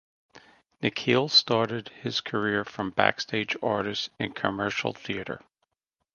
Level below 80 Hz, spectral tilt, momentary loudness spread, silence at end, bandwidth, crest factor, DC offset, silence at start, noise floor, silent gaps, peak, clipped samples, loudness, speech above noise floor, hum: -62 dBFS; -4.5 dB/octave; 13 LU; 0.75 s; 9.8 kHz; 26 dB; under 0.1%; 0.35 s; -82 dBFS; none; -2 dBFS; under 0.1%; -27 LUFS; 55 dB; none